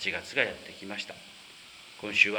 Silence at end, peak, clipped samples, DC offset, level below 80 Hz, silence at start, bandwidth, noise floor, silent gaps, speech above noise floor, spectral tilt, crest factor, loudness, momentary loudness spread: 0 s; -6 dBFS; under 0.1%; under 0.1%; -68 dBFS; 0 s; over 20 kHz; -50 dBFS; none; 20 dB; -2.5 dB/octave; 26 dB; -31 LUFS; 19 LU